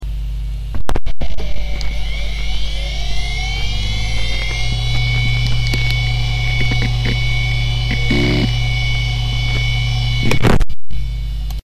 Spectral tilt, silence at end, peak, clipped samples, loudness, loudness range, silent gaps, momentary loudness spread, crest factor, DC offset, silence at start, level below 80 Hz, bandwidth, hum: -5 dB/octave; 0.05 s; -4 dBFS; under 0.1%; -19 LUFS; 6 LU; none; 10 LU; 8 dB; under 0.1%; 0 s; -20 dBFS; 13 kHz; none